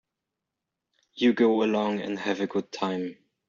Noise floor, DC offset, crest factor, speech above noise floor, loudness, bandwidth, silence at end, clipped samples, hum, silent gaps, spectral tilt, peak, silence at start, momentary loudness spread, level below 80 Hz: -86 dBFS; under 0.1%; 18 dB; 60 dB; -26 LUFS; 7.4 kHz; 0.35 s; under 0.1%; none; none; -4 dB/octave; -10 dBFS; 1.15 s; 9 LU; -72 dBFS